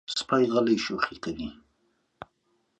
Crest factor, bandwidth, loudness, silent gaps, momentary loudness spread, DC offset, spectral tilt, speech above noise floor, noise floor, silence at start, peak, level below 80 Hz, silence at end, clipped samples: 18 dB; 9 kHz; -26 LUFS; none; 13 LU; under 0.1%; -4.5 dB/octave; 46 dB; -72 dBFS; 0.1 s; -10 dBFS; -60 dBFS; 1.25 s; under 0.1%